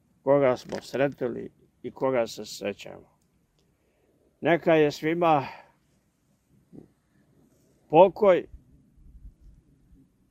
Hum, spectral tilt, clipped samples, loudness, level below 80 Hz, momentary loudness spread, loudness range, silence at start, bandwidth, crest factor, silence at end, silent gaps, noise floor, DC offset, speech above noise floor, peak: none; -6 dB/octave; under 0.1%; -24 LUFS; -60 dBFS; 22 LU; 6 LU; 0.25 s; 15.5 kHz; 22 dB; 1.05 s; none; -69 dBFS; under 0.1%; 45 dB; -4 dBFS